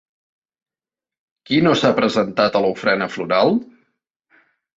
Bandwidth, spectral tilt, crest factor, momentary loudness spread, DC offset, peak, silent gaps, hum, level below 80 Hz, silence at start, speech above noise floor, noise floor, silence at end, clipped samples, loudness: 8 kHz; -5.5 dB/octave; 18 dB; 5 LU; under 0.1%; -2 dBFS; none; none; -60 dBFS; 1.5 s; over 73 dB; under -90 dBFS; 1.15 s; under 0.1%; -18 LUFS